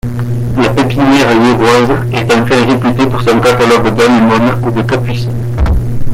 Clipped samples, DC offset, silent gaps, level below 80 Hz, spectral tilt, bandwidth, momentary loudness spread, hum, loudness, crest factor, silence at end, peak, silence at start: under 0.1%; under 0.1%; none; -22 dBFS; -6.5 dB/octave; 16 kHz; 7 LU; none; -10 LUFS; 8 dB; 0 s; 0 dBFS; 0.05 s